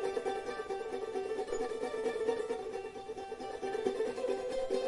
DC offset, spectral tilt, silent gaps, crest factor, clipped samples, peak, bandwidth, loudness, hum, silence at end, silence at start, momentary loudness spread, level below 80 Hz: under 0.1%; -4 dB/octave; none; 18 dB; under 0.1%; -18 dBFS; 11.5 kHz; -38 LUFS; none; 0 s; 0 s; 8 LU; -62 dBFS